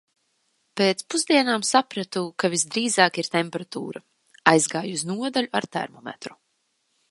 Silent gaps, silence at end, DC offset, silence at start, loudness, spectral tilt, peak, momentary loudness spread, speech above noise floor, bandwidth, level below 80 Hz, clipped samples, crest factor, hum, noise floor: none; 0.8 s; under 0.1%; 0.75 s; -23 LUFS; -3 dB/octave; 0 dBFS; 17 LU; 48 dB; 11.5 kHz; -72 dBFS; under 0.1%; 24 dB; none; -72 dBFS